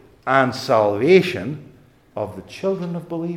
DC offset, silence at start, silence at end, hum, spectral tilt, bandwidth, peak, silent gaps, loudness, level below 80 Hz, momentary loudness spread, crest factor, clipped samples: under 0.1%; 0.25 s; 0 s; none; -6.5 dB/octave; 14 kHz; 0 dBFS; none; -20 LUFS; -62 dBFS; 15 LU; 20 dB; under 0.1%